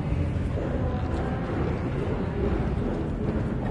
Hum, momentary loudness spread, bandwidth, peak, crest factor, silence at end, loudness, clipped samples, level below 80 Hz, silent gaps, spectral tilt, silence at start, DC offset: none; 2 LU; 10 kHz; -12 dBFS; 14 dB; 0 s; -28 LUFS; under 0.1%; -34 dBFS; none; -9 dB/octave; 0 s; under 0.1%